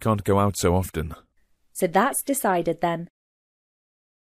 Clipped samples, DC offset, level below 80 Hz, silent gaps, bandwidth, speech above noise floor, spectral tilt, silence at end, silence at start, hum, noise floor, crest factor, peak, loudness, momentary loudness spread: under 0.1%; under 0.1%; -46 dBFS; none; 15.5 kHz; 41 dB; -5.5 dB/octave; 1.35 s; 0 s; none; -64 dBFS; 18 dB; -8 dBFS; -23 LUFS; 13 LU